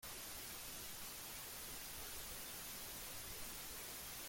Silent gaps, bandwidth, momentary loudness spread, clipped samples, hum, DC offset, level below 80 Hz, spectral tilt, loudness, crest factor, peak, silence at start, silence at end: none; 17 kHz; 1 LU; under 0.1%; none; under 0.1%; -64 dBFS; -1 dB/octave; -48 LUFS; 14 dB; -36 dBFS; 0 s; 0 s